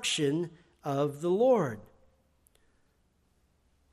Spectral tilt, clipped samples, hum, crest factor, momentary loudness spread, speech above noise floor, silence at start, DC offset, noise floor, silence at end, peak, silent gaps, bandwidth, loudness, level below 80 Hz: -5 dB/octave; under 0.1%; none; 18 dB; 16 LU; 42 dB; 0 s; under 0.1%; -71 dBFS; 2.1 s; -14 dBFS; none; 14.5 kHz; -29 LUFS; -70 dBFS